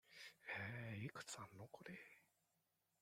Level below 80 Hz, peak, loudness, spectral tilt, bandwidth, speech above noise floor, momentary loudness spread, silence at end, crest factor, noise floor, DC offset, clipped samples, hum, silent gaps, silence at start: -84 dBFS; -36 dBFS; -53 LUFS; -4 dB/octave; 16 kHz; 30 dB; 11 LU; 0.75 s; 18 dB; -87 dBFS; under 0.1%; under 0.1%; none; none; 0.05 s